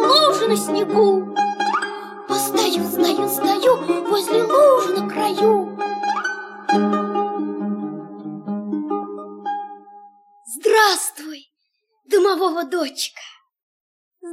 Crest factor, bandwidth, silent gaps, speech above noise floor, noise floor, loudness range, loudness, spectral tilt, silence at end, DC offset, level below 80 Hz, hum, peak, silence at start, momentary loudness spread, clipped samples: 16 dB; 16.5 kHz; 13.63-14.11 s; 54 dB; -72 dBFS; 6 LU; -19 LUFS; -3.5 dB/octave; 0 s; under 0.1%; -70 dBFS; none; -4 dBFS; 0 s; 16 LU; under 0.1%